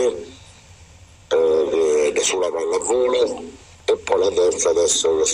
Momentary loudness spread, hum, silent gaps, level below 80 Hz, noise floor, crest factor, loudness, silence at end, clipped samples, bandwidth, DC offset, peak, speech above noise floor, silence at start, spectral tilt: 10 LU; none; none; -52 dBFS; -46 dBFS; 14 dB; -19 LUFS; 0 s; under 0.1%; 15.5 kHz; under 0.1%; -4 dBFS; 27 dB; 0 s; -2 dB/octave